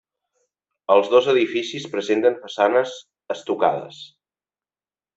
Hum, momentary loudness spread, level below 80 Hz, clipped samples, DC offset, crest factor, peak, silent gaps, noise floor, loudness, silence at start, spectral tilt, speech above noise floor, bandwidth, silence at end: 50 Hz at -60 dBFS; 18 LU; -70 dBFS; under 0.1%; under 0.1%; 20 dB; -2 dBFS; none; under -90 dBFS; -20 LUFS; 0.9 s; -4.5 dB/octave; over 70 dB; 8 kHz; 1.1 s